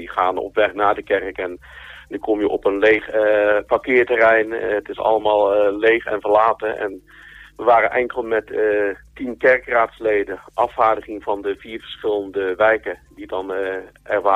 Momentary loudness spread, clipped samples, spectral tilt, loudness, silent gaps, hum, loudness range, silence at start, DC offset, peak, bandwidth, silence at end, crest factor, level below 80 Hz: 13 LU; under 0.1%; -6 dB/octave; -19 LUFS; none; none; 5 LU; 0 s; under 0.1%; -4 dBFS; 7.6 kHz; 0 s; 16 dB; -52 dBFS